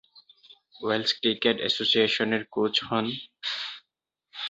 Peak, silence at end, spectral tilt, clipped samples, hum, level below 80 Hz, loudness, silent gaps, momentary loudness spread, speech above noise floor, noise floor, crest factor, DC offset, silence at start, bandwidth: -8 dBFS; 0 s; -4 dB/octave; under 0.1%; none; -68 dBFS; -26 LUFS; none; 13 LU; 57 dB; -83 dBFS; 20 dB; under 0.1%; 0.15 s; 8 kHz